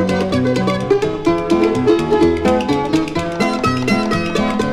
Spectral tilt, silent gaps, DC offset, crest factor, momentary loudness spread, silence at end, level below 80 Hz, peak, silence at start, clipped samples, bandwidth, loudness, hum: -6 dB/octave; none; under 0.1%; 14 dB; 4 LU; 0 s; -40 dBFS; -2 dBFS; 0 s; under 0.1%; 13.5 kHz; -16 LUFS; none